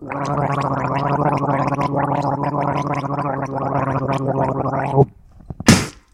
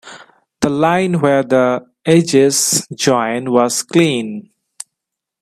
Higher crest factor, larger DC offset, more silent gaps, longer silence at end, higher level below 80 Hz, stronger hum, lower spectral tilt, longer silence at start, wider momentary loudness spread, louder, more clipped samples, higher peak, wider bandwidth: about the same, 20 dB vs 16 dB; neither; neither; second, 0.2 s vs 1 s; first, -44 dBFS vs -56 dBFS; neither; about the same, -5.5 dB/octave vs -4.5 dB/octave; about the same, 0 s vs 0.05 s; second, 6 LU vs 18 LU; second, -19 LUFS vs -14 LUFS; neither; about the same, 0 dBFS vs 0 dBFS; about the same, 16 kHz vs 16 kHz